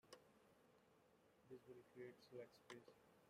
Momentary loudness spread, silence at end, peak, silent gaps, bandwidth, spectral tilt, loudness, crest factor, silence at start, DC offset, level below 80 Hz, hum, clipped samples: 6 LU; 0 s; -42 dBFS; none; 15 kHz; -5 dB/octave; -63 LUFS; 22 dB; 0.05 s; under 0.1%; under -90 dBFS; none; under 0.1%